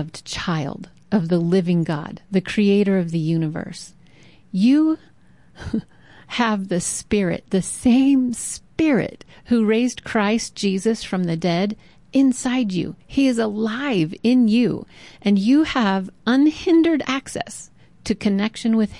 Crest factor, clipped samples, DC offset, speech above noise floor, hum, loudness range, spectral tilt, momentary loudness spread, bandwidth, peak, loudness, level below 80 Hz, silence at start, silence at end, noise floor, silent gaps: 12 dB; under 0.1%; 0.2%; 31 dB; none; 3 LU; -5.5 dB/octave; 12 LU; 11.5 kHz; -8 dBFS; -20 LUFS; -50 dBFS; 0 s; 0 s; -50 dBFS; none